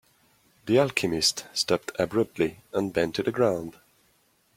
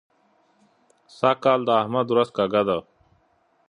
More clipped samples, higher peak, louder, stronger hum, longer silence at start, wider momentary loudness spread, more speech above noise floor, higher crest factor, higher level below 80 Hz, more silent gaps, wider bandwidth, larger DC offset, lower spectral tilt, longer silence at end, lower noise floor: neither; about the same, -6 dBFS vs -4 dBFS; second, -26 LUFS vs -22 LUFS; neither; second, 0.65 s vs 1.2 s; about the same, 7 LU vs 5 LU; about the same, 40 dB vs 43 dB; about the same, 22 dB vs 20 dB; about the same, -60 dBFS vs -64 dBFS; neither; first, 16.5 kHz vs 10.5 kHz; neither; second, -4 dB/octave vs -7 dB/octave; about the same, 0.85 s vs 0.85 s; about the same, -66 dBFS vs -64 dBFS